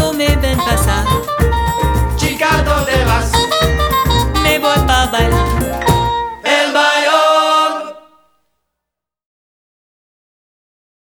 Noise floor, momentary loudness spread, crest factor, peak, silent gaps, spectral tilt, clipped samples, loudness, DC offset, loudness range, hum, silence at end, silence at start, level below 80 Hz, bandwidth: -81 dBFS; 5 LU; 14 dB; 0 dBFS; none; -4.5 dB/octave; under 0.1%; -13 LUFS; under 0.1%; 4 LU; none; 3.15 s; 0 s; -22 dBFS; over 20 kHz